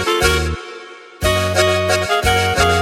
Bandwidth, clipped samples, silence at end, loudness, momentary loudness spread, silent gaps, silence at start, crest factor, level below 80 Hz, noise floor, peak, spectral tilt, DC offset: 16 kHz; under 0.1%; 0 s; -16 LUFS; 16 LU; none; 0 s; 16 dB; -28 dBFS; -36 dBFS; 0 dBFS; -3.5 dB/octave; under 0.1%